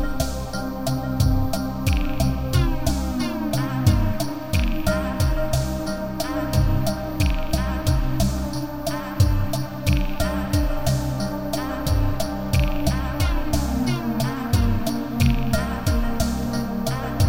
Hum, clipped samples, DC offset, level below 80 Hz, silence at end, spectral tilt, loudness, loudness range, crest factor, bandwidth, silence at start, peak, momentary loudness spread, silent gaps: none; under 0.1%; 1%; -26 dBFS; 0 s; -6 dB/octave; -24 LUFS; 1 LU; 16 dB; 17 kHz; 0 s; -4 dBFS; 5 LU; none